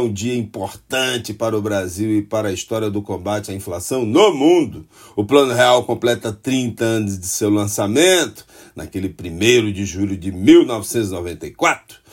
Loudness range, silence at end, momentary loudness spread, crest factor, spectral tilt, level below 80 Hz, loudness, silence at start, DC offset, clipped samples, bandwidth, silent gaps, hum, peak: 5 LU; 0.2 s; 14 LU; 18 dB; -4.5 dB/octave; -50 dBFS; -18 LUFS; 0 s; under 0.1%; under 0.1%; 16.5 kHz; none; none; 0 dBFS